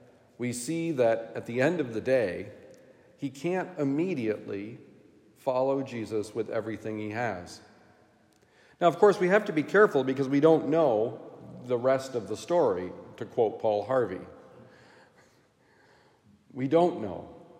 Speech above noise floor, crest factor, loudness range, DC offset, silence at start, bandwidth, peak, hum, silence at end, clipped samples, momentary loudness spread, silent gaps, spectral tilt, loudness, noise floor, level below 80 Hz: 36 dB; 22 dB; 9 LU; under 0.1%; 0.4 s; 16 kHz; -8 dBFS; none; 0.15 s; under 0.1%; 17 LU; none; -6 dB/octave; -28 LUFS; -63 dBFS; -76 dBFS